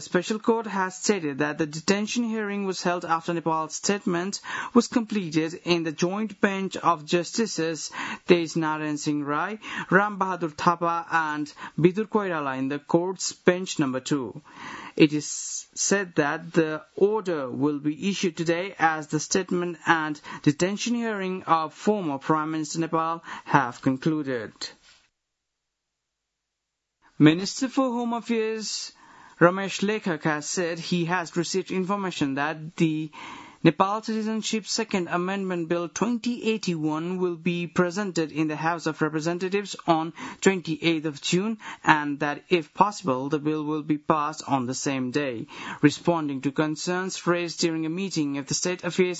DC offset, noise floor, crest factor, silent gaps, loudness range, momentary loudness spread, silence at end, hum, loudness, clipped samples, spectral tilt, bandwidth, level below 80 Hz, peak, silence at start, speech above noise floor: under 0.1%; -82 dBFS; 26 dB; none; 2 LU; 7 LU; 0 s; none; -26 LUFS; under 0.1%; -4.5 dB/octave; 8 kHz; -68 dBFS; 0 dBFS; 0 s; 57 dB